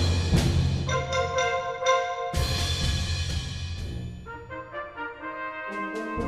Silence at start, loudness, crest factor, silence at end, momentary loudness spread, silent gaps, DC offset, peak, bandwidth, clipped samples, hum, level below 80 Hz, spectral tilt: 0 s; -28 LUFS; 18 dB; 0 s; 13 LU; none; under 0.1%; -10 dBFS; 14.5 kHz; under 0.1%; none; -36 dBFS; -4.5 dB/octave